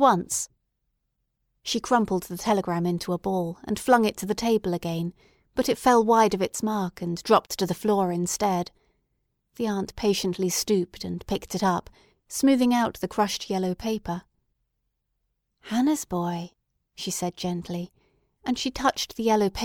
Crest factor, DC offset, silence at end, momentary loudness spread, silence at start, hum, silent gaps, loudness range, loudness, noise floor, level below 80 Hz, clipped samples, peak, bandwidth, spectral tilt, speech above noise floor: 20 dB; under 0.1%; 0 s; 12 LU; 0 s; none; none; 7 LU; -26 LUFS; -78 dBFS; -54 dBFS; under 0.1%; -6 dBFS; 19.5 kHz; -4.5 dB/octave; 53 dB